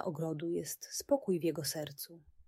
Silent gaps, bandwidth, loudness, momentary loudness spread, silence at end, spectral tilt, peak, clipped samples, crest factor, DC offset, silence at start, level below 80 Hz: none; 16 kHz; -36 LUFS; 11 LU; 0.05 s; -4.5 dB/octave; -18 dBFS; under 0.1%; 20 dB; under 0.1%; 0 s; -72 dBFS